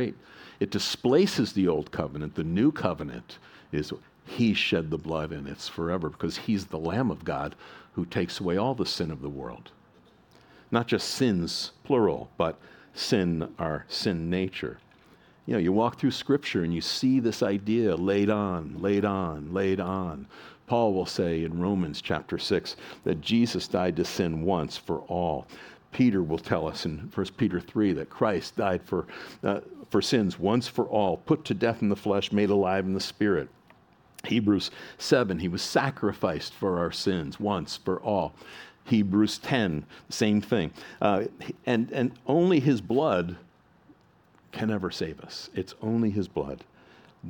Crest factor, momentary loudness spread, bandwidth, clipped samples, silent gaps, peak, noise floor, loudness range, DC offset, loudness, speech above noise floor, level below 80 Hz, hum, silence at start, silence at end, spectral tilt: 20 dB; 11 LU; 18 kHz; under 0.1%; none; -8 dBFS; -61 dBFS; 4 LU; under 0.1%; -28 LUFS; 33 dB; -54 dBFS; none; 0 s; 0 s; -6 dB/octave